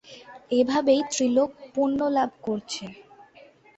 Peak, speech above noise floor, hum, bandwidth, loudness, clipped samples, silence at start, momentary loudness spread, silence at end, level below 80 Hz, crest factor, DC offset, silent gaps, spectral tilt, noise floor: -8 dBFS; 29 dB; none; 8.4 kHz; -25 LUFS; under 0.1%; 0.1 s; 14 LU; 0.75 s; -66 dBFS; 16 dB; under 0.1%; none; -4 dB/octave; -53 dBFS